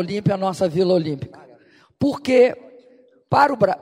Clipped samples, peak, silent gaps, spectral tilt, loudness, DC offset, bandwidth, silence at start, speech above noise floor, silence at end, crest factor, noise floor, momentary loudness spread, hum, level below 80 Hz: under 0.1%; -2 dBFS; none; -7 dB/octave; -19 LUFS; under 0.1%; 13 kHz; 0 s; 34 dB; 0.05 s; 18 dB; -53 dBFS; 13 LU; none; -58 dBFS